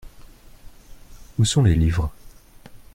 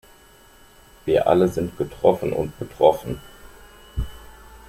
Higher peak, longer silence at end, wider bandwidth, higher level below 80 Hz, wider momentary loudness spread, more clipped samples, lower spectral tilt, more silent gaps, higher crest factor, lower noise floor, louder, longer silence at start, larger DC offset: second, -6 dBFS vs -2 dBFS; about the same, 0.2 s vs 0.1 s; about the same, 15 kHz vs 16 kHz; first, -34 dBFS vs -40 dBFS; about the same, 14 LU vs 15 LU; neither; second, -5.5 dB/octave vs -7 dB/octave; neither; about the same, 18 dB vs 22 dB; second, -44 dBFS vs -50 dBFS; about the same, -21 LUFS vs -22 LUFS; second, 0.05 s vs 1.05 s; neither